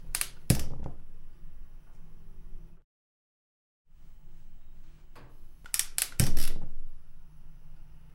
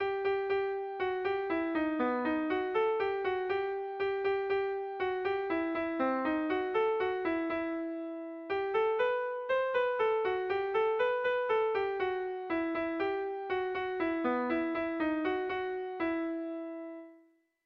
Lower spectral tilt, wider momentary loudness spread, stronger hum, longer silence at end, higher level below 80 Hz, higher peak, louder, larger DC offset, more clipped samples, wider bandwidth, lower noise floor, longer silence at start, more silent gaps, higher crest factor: second, -3.5 dB/octave vs -6.5 dB/octave; first, 27 LU vs 6 LU; neither; second, 0.05 s vs 0.5 s; first, -36 dBFS vs -66 dBFS; first, -4 dBFS vs -20 dBFS; about the same, -32 LUFS vs -33 LUFS; neither; neither; first, 16.5 kHz vs 5.8 kHz; first, under -90 dBFS vs -65 dBFS; about the same, 0 s vs 0 s; first, 2.84-3.85 s vs none; first, 26 dB vs 12 dB